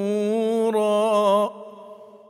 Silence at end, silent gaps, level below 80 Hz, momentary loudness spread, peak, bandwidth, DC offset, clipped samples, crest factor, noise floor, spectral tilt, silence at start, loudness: 0.15 s; none; -82 dBFS; 14 LU; -8 dBFS; 15.5 kHz; under 0.1%; under 0.1%; 14 dB; -44 dBFS; -5.5 dB/octave; 0 s; -21 LUFS